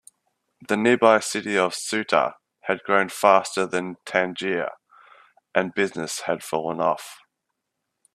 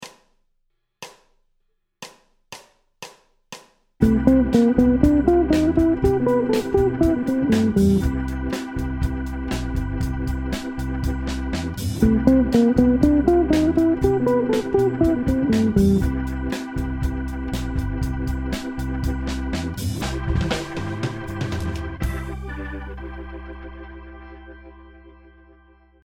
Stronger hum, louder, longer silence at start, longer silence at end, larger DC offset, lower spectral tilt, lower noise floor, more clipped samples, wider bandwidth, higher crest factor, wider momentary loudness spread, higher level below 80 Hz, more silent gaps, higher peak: neither; about the same, -23 LUFS vs -21 LUFS; first, 0.6 s vs 0 s; about the same, 1 s vs 0.95 s; neither; second, -3.5 dB/octave vs -7.5 dB/octave; first, -80 dBFS vs -70 dBFS; neither; second, 15 kHz vs 17.5 kHz; about the same, 22 dB vs 22 dB; second, 10 LU vs 24 LU; second, -70 dBFS vs -30 dBFS; neither; about the same, -2 dBFS vs 0 dBFS